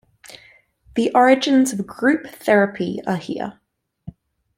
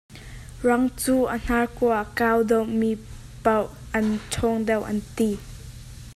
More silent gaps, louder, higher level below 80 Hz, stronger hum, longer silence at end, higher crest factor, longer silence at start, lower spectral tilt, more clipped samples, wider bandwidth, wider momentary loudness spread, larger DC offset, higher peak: neither; first, -19 LUFS vs -24 LUFS; second, -58 dBFS vs -42 dBFS; neither; first, 0.45 s vs 0 s; about the same, 18 dB vs 18 dB; first, 0.3 s vs 0.1 s; about the same, -5 dB/octave vs -5.5 dB/octave; neither; first, 16 kHz vs 14.5 kHz; second, 13 LU vs 20 LU; neither; first, -2 dBFS vs -6 dBFS